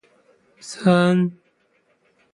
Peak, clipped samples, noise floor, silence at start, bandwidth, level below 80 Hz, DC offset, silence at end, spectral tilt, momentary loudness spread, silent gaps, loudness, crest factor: -4 dBFS; under 0.1%; -64 dBFS; 0.65 s; 11.5 kHz; -66 dBFS; under 0.1%; 1 s; -7 dB/octave; 21 LU; none; -19 LUFS; 20 dB